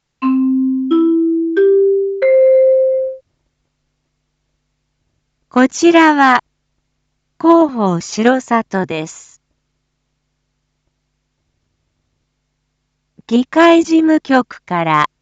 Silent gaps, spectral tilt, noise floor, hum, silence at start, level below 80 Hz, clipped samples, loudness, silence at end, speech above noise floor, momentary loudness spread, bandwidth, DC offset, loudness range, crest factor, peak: none; -5.5 dB/octave; -69 dBFS; none; 0.2 s; -64 dBFS; under 0.1%; -13 LUFS; 0.15 s; 57 dB; 10 LU; 8 kHz; under 0.1%; 8 LU; 14 dB; 0 dBFS